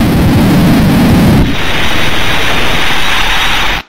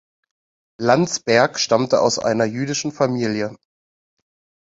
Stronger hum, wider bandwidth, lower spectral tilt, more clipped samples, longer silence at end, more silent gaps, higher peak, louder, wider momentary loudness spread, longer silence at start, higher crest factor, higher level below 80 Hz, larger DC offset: neither; first, 16.5 kHz vs 8 kHz; about the same, -5 dB/octave vs -4 dB/octave; neither; second, 0 s vs 1.1 s; neither; about the same, 0 dBFS vs 0 dBFS; first, -9 LUFS vs -19 LUFS; second, 4 LU vs 7 LU; second, 0 s vs 0.8 s; second, 10 dB vs 20 dB; first, -18 dBFS vs -60 dBFS; first, 30% vs under 0.1%